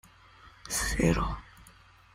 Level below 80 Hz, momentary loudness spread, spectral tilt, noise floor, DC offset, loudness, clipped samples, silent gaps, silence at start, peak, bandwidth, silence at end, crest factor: -40 dBFS; 16 LU; -4.5 dB/octave; -57 dBFS; under 0.1%; -29 LUFS; under 0.1%; none; 0.45 s; -12 dBFS; 16 kHz; 0.5 s; 20 dB